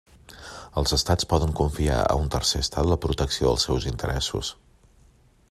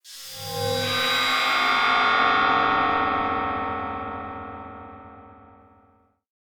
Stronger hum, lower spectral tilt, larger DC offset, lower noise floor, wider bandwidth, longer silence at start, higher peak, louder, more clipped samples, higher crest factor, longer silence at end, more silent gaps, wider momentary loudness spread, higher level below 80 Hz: neither; first, -4.5 dB/octave vs -3 dB/octave; neither; second, -57 dBFS vs -61 dBFS; second, 14 kHz vs over 20 kHz; first, 0.3 s vs 0.05 s; about the same, -8 dBFS vs -8 dBFS; about the same, -24 LUFS vs -22 LUFS; neither; about the same, 18 dB vs 16 dB; second, 1 s vs 1.2 s; neither; second, 10 LU vs 18 LU; first, -34 dBFS vs -54 dBFS